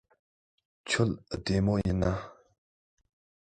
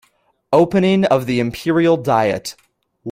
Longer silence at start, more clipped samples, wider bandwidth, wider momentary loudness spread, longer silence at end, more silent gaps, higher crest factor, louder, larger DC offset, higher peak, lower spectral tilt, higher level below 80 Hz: first, 0.85 s vs 0.5 s; neither; second, 9.2 kHz vs 16 kHz; first, 13 LU vs 10 LU; first, 1.2 s vs 0 s; neither; about the same, 20 dB vs 16 dB; second, -30 LUFS vs -16 LUFS; neither; second, -12 dBFS vs -2 dBFS; about the same, -6 dB/octave vs -6.5 dB/octave; first, -46 dBFS vs -52 dBFS